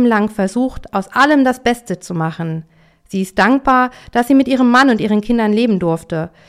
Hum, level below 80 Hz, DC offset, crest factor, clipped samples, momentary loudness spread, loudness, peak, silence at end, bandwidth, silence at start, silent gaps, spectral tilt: none; -42 dBFS; under 0.1%; 12 dB; under 0.1%; 12 LU; -15 LUFS; -2 dBFS; 0.2 s; 15 kHz; 0 s; none; -6 dB/octave